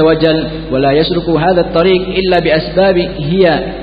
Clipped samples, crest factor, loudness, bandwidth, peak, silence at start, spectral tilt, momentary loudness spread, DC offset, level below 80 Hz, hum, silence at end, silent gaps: under 0.1%; 12 dB; -12 LUFS; 5.2 kHz; 0 dBFS; 0 s; -9 dB/octave; 4 LU; under 0.1%; -30 dBFS; none; 0 s; none